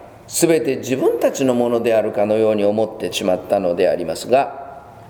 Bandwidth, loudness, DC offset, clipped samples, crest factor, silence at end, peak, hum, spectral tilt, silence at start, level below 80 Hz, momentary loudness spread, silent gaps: over 20 kHz; -18 LUFS; under 0.1%; under 0.1%; 18 dB; 0 s; 0 dBFS; none; -4.5 dB/octave; 0 s; -56 dBFS; 6 LU; none